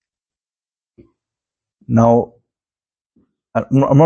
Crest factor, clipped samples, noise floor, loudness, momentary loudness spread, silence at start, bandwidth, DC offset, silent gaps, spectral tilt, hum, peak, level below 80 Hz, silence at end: 18 dB; under 0.1%; under -90 dBFS; -16 LUFS; 11 LU; 1.9 s; 7 kHz; under 0.1%; none; -9.5 dB/octave; none; 0 dBFS; -50 dBFS; 0 s